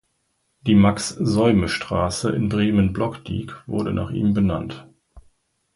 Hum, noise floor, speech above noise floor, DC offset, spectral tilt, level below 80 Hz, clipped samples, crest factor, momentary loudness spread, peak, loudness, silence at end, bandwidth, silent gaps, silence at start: none; -70 dBFS; 50 dB; under 0.1%; -6 dB/octave; -40 dBFS; under 0.1%; 18 dB; 13 LU; -4 dBFS; -21 LUFS; 0.55 s; 11.5 kHz; none; 0.65 s